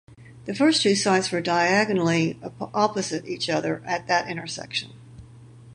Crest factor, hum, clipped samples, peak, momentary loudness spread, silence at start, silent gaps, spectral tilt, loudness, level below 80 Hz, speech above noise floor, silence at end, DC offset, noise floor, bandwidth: 20 dB; none; under 0.1%; -6 dBFS; 12 LU; 0.1 s; none; -4 dB/octave; -23 LUFS; -62 dBFS; 23 dB; 0 s; under 0.1%; -46 dBFS; 11 kHz